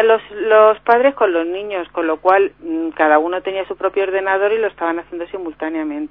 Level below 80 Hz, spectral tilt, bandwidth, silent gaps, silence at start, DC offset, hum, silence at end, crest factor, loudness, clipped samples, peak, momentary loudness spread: -56 dBFS; -7 dB/octave; 5.4 kHz; none; 0 s; 0.1%; none; 0.05 s; 16 dB; -17 LUFS; under 0.1%; 0 dBFS; 12 LU